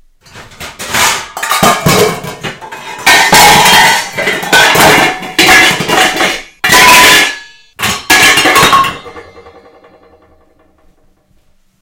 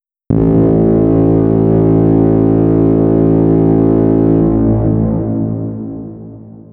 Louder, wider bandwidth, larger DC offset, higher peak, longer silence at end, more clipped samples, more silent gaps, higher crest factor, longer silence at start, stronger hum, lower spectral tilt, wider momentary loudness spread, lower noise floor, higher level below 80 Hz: first, -6 LUFS vs -11 LUFS; first, over 20 kHz vs 2.9 kHz; neither; about the same, 0 dBFS vs 0 dBFS; first, 2.6 s vs 0.15 s; first, 3% vs under 0.1%; neither; about the same, 10 dB vs 10 dB; about the same, 0.35 s vs 0.3 s; neither; second, -1.5 dB/octave vs -14 dB/octave; first, 19 LU vs 10 LU; first, -49 dBFS vs -32 dBFS; second, -36 dBFS vs -28 dBFS